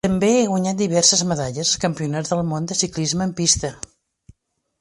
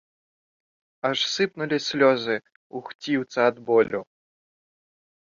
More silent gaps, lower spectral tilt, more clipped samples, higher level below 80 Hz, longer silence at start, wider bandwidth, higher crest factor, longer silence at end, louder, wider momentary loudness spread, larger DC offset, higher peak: second, none vs 2.56-2.70 s, 2.95-2.99 s; about the same, -3.5 dB/octave vs -4 dB/octave; neither; first, -46 dBFS vs -70 dBFS; second, 0.05 s vs 1.05 s; first, 11.5 kHz vs 7.4 kHz; about the same, 20 dB vs 20 dB; second, 1 s vs 1.35 s; first, -19 LUFS vs -24 LUFS; second, 9 LU vs 14 LU; neither; first, 0 dBFS vs -6 dBFS